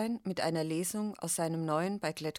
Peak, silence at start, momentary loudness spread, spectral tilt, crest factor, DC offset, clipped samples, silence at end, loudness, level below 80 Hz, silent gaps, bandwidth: -18 dBFS; 0 s; 3 LU; -4.5 dB/octave; 16 dB; under 0.1%; under 0.1%; 0 s; -34 LUFS; -72 dBFS; none; 18 kHz